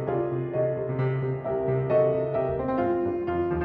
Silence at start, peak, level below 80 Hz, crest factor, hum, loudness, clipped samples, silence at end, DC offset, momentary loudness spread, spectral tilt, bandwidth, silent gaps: 0 s; -12 dBFS; -50 dBFS; 14 dB; none; -26 LUFS; under 0.1%; 0 s; under 0.1%; 5 LU; -11.5 dB/octave; 4.6 kHz; none